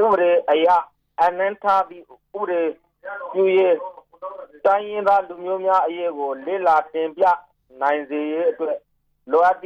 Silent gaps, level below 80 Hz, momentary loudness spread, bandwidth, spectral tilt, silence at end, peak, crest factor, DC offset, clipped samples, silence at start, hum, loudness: none; -68 dBFS; 16 LU; 7 kHz; -6 dB/octave; 0.05 s; -8 dBFS; 12 dB; under 0.1%; under 0.1%; 0 s; none; -20 LUFS